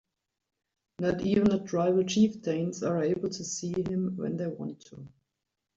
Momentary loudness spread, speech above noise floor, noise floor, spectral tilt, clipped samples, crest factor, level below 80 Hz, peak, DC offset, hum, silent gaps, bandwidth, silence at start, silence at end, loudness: 13 LU; 57 dB; -85 dBFS; -6 dB/octave; under 0.1%; 18 dB; -62 dBFS; -12 dBFS; under 0.1%; none; none; 7.8 kHz; 1 s; 0.7 s; -29 LUFS